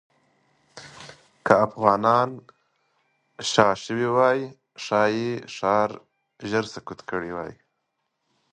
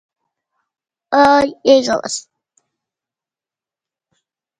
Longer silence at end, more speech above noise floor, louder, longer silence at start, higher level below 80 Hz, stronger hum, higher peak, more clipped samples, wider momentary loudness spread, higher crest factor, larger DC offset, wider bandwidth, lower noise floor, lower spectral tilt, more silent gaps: second, 1 s vs 2.4 s; second, 54 dB vs 76 dB; second, -23 LUFS vs -14 LUFS; second, 0.75 s vs 1.1 s; second, -64 dBFS vs -56 dBFS; neither; about the same, 0 dBFS vs 0 dBFS; neither; first, 22 LU vs 12 LU; first, 24 dB vs 18 dB; neither; about the same, 11 kHz vs 11 kHz; second, -77 dBFS vs -89 dBFS; first, -5 dB/octave vs -3 dB/octave; neither